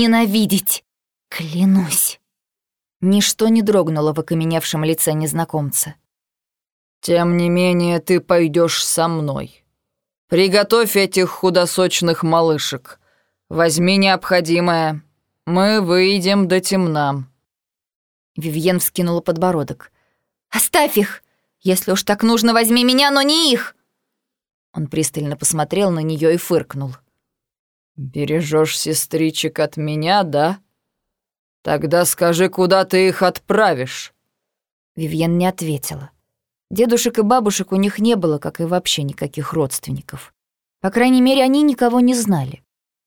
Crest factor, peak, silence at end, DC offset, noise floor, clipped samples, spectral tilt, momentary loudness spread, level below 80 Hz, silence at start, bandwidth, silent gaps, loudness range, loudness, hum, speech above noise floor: 18 dB; 0 dBFS; 0.5 s; under 0.1%; -87 dBFS; under 0.1%; -4.5 dB/octave; 13 LU; -56 dBFS; 0 s; over 20 kHz; 2.96-3.00 s, 6.72-7.01 s, 10.18-10.28 s, 17.95-18.35 s, 24.54-24.73 s, 27.59-27.95 s, 31.39-31.64 s, 34.71-34.95 s; 5 LU; -16 LUFS; none; 71 dB